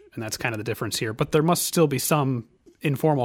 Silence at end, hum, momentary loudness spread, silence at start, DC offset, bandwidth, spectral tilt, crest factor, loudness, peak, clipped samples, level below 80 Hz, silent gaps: 0 s; none; 9 LU; 0.15 s; under 0.1%; 19 kHz; -5 dB/octave; 16 dB; -24 LUFS; -8 dBFS; under 0.1%; -56 dBFS; none